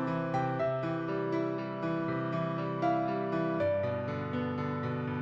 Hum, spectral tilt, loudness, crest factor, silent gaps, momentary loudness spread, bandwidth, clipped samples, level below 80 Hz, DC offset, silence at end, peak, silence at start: none; -9 dB/octave; -33 LUFS; 14 dB; none; 4 LU; 7.6 kHz; under 0.1%; -66 dBFS; under 0.1%; 0 s; -18 dBFS; 0 s